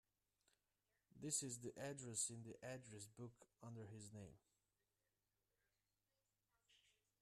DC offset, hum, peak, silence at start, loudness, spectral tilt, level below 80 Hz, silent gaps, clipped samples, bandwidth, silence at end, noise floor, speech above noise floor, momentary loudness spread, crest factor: under 0.1%; 50 Hz at -85 dBFS; -30 dBFS; 1.15 s; -51 LUFS; -3.5 dB/octave; -86 dBFS; none; under 0.1%; 13.5 kHz; 0.45 s; under -90 dBFS; over 37 dB; 15 LU; 26 dB